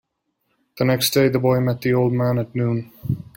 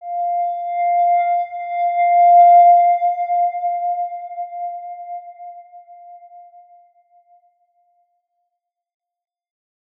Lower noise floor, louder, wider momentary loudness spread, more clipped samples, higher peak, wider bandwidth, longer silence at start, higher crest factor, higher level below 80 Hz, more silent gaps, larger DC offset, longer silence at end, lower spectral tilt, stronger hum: second, -72 dBFS vs -78 dBFS; second, -20 LUFS vs -15 LUFS; second, 9 LU vs 22 LU; neither; about the same, -4 dBFS vs -4 dBFS; first, 17 kHz vs 3.7 kHz; first, 0.75 s vs 0 s; about the same, 16 dB vs 14 dB; first, -54 dBFS vs -84 dBFS; neither; neither; second, 0.15 s vs 3.6 s; first, -6 dB/octave vs -2.5 dB/octave; neither